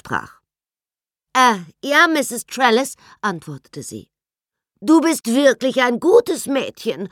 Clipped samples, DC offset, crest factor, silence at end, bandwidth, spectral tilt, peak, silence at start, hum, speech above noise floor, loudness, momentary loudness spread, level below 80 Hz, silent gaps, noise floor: under 0.1%; under 0.1%; 18 dB; 0.05 s; 17 kHz; -3.5 dB/octave; -2 dBFS; 0.05 s; none; over 72 dB; -17 LUFS; 18 LU; -64 dBFS; none; under -90 dBFS